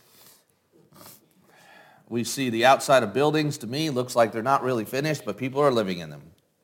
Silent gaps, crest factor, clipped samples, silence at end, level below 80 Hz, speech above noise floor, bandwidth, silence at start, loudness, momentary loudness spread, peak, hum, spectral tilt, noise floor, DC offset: none; 20 dB; under 0.1%; 0.45 s; -70 dBFS; 38 dB; 17 kHz; 1.05 s; -24 LUFS; 11 LU; -6 dBFS; none; -4.5 dB/octave; -61 dBFS; under 0.1%